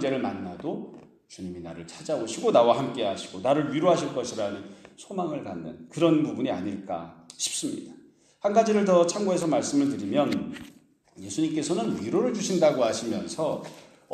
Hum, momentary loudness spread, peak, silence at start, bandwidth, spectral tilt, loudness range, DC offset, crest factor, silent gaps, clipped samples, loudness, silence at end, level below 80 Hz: none; 17 LU; -8 dBFS; 0 s; 14 kHz; -5 dB/octave; 4 LU; under 0.1%; 20 dB; none; under 0.1%; -26 LUFS; 0 s; -68 dBFS